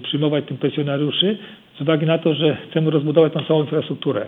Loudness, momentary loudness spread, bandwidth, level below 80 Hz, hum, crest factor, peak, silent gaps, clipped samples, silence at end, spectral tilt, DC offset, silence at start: -19 LUFS; 6 LU; 4 kHz; -68 dBFS; none; 18 dB; 0 dBFS; none; under 0.1%; 0 s; -9.5 dB/octave; under 0.1%; 0 s